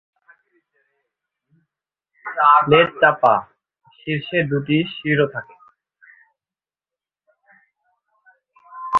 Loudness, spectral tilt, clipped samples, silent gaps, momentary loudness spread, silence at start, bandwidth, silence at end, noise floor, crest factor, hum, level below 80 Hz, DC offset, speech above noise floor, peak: -17 LUFS; -7.5 dB/octave; under 0.1%; none; 19 LU; 2.25 s; 6.6 kHz; 0 s; under -90 dBFS; 22 dB; none; -60 dBFS; under 0.1%; over 73 dB; 0 dBFS